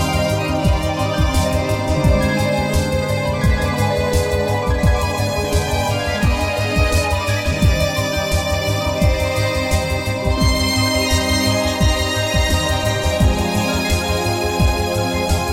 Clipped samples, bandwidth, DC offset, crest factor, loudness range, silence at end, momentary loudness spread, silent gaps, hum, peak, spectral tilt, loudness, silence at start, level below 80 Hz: under 0.1%; 16.5 kHz; under 0.1%; 12 dB; 1 LU; 0 s; 3 LU; none; none; -4 dBFS; -5 dB/octave; -18 LUFS; 0 s; -24 dBFS